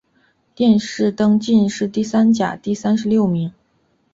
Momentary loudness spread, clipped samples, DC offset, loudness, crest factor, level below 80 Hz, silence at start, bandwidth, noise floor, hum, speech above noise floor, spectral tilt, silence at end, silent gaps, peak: 7 LU; under 0.1%; under 0.1%; -17 LUFS; 14 dB; -56 dBFS; 0.6 s; 7.8 kHz; -62 dBFS; none; 46 dB; -6.5 dB/octave; 0.65 s; none; -4 dBFS